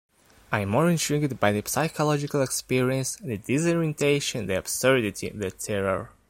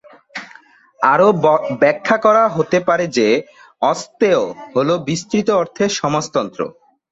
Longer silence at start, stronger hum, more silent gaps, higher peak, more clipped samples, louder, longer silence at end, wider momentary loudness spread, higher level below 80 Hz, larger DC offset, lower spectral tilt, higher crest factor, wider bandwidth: first, 0.5 s vs 0.35 s; neither; neither; second, -4 dBFS vs 0 dBFS; neither; second, -25 LUFS vs -16 LUFS; second, 0.2 s vs 0.4 s; second, 8 LU vs 12 LU; about the same, -56 dBFS vs -58 dBFS; neither; about the same, -4.5 dB/octave vs -5 dB/octave; about the same, 20 dB vs 16 dB; first, 16.5 kHz vs 8 kHz